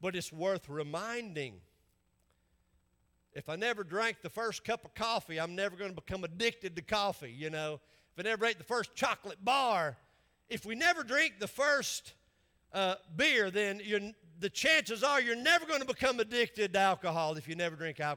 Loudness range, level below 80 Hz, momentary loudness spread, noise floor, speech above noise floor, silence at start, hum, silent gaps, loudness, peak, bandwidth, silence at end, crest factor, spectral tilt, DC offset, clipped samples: 9 LU; -68 dBFS; 13 LU; -75 dBFS; 41 dB; 0 s; none; none; -33 LUFS; -14 dBFS; 18 kHz; 0 s; 20 dB; -3 dB/octave; under 0.1%; under 0.1%